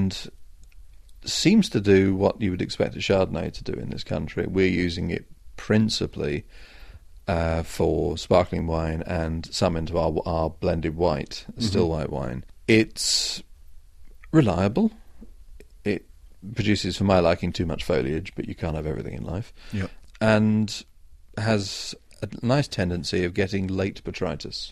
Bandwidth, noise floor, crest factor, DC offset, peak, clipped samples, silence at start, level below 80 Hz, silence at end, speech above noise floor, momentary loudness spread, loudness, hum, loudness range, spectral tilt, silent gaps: 14.5 kHz; -45 dBFS; 20 dB; under 0.1%; -4 dBFS; under 0.1%; 0 s; -42 dBFS; 0 s; 21 dB; 13 LU; -25 LUFS; none; 4 LU; -5.5 dB/octave; none